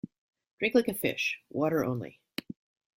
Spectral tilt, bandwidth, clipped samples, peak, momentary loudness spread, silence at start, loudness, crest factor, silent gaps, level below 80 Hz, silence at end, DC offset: -5 dB/octave; 16 kHz; under 0.1%; -10 dBFS; 19 LU; 0.05 s; -30 LUFS; 22 dB; 0.18-0.29 s, 0.51-0.58 s; -68 dBFS; 0.9 s; under 0.1%